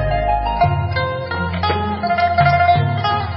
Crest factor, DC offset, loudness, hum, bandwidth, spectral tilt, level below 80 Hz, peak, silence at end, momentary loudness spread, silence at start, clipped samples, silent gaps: 14 dB; under 0.1%; -17 LUFS; none; 5.8 kHz; -11 dB/octave; -28 dBFS; -2 dBFS; 0 s; 7 LU; 0 s; under 0.1%; none